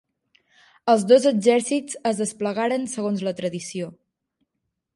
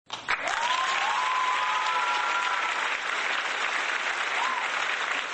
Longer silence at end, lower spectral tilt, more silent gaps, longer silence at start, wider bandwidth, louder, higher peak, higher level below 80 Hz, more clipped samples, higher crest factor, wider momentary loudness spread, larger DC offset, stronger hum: first, 1.05 s vs 0 s; first, -4.5 dB/octave vs 1 dB/octave; neither; first, 0.85 s vs 0.1 s; first, 11.5 kHz vs 9.6 kHz; first, -22 LUFS vs -26 LUFS; first, -4 dBFS vs -12 dBFS; about the same, -72 dBFS vs -70 dBFS; neither; about the same, 20 dB vs 16 dB; first, 14 LU vs 2 LU; neither; neither